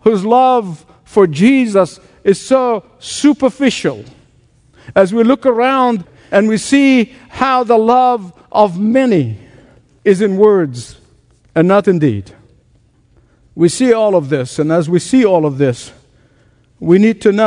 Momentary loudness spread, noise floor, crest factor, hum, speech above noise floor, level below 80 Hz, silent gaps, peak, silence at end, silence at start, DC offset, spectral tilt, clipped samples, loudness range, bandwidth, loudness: 11 LU; -52 dBFS; 12 dB; none; 40 dB; -52 dBFS; none; 0 dBFS; 0 s; 0.05 s; under 0.1%; -6 dB/octave; 0.1%; 3 LU; 11 kHz; -13 LUFS